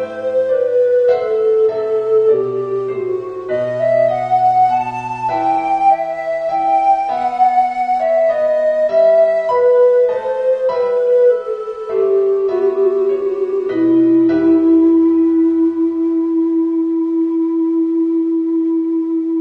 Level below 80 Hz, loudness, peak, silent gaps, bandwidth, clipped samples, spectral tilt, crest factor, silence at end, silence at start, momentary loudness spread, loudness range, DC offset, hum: -56 dBFS; -15 LUFS; -4 dBFS; none; 5.8 kHz; under 0.1%; -8 dB/octave; 10 dB; 0 s; 0 s; 8 LU; 3 LU; under 0.1%; none